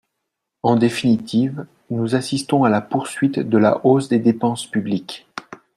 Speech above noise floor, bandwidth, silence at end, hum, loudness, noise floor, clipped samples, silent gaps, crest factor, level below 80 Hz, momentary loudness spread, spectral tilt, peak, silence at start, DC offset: 60 dB; 12.5 kHz; 0.2 s; none; -19 LUFS; -78 dBFS; under 0.1%; none; 16 dB; -60 dBFS; 12 LU; -6.5 dB/octave; -2 dBFS; 0.65 s; under 0.1%